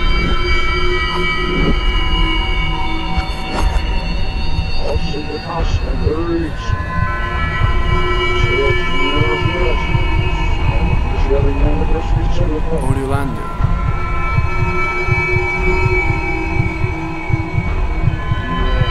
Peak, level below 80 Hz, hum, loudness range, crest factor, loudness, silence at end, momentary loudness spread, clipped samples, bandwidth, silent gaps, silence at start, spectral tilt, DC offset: -2 dBFS; -18 dBFS; none; 4 LU; 12 dB; -18 LUFS; 0 s; 6 LU; under 0.1%; 11 kHz; none; 0 s; -6.5 dB/octave; 1%